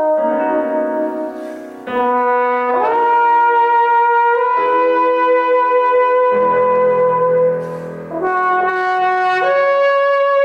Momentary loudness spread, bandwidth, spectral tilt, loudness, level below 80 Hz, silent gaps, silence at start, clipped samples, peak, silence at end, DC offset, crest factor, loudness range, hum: 9 LU; 6.6 kHz; -6.5 dB/octave; -14 LUFS; -64 dBFS; none; 0 s; under 0.1%; -4 dBFS; 0 s; under 0.1%; 10 dB; 2 LU; none